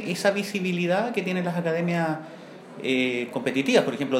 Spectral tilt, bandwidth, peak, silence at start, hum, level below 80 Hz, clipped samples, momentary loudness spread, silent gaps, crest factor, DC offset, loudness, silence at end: -5.5 dB/octave; 15.5 kHz; -6 dBFS; 0 s; none; -76 dBFS; under 0.1%; 11 LU; none; 20 dB; under 0.1%; -25 LUFS; 0 s